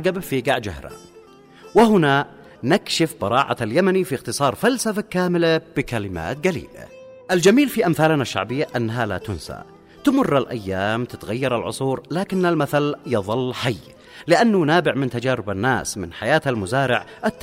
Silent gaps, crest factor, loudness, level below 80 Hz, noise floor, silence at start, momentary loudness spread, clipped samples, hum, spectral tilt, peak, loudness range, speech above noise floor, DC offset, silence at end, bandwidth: none; 16 dB; -20 LUFS; -50 dBFS; -46 dBFS; 0 s; 12 LU; under 0.1%; none; -5.5 dB/octave; -4 dBFS; 3 LU; 26 dB; under 0.1%; 0 s; 16 kHz